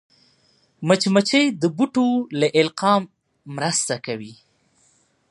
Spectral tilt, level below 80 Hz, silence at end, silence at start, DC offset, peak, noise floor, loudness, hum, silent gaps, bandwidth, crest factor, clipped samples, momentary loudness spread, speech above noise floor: -4 dB/octave; -70 dBFS; 0.95 s; 0.8 s; under 0.1%; -2 dBFS; -62 dBFS; -20 LUFS; none; none; 11.5 kHz; 20 dB; under 0.1%; 14 LU; 42 dB